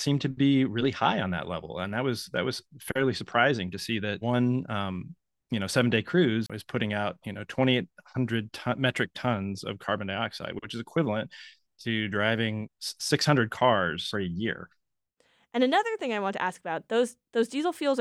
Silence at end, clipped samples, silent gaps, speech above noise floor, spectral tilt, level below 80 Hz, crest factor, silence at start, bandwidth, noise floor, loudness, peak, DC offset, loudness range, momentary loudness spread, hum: 0 s; under 0.1%; none; 44 dB; -5.5 dB/octave; -64 dBFS; 22 dB; 0 s; 13 kHz; -72 dBFS; -28 LUFS; -6 dBFS; under 0.1%; 3 LU; 11 LU; none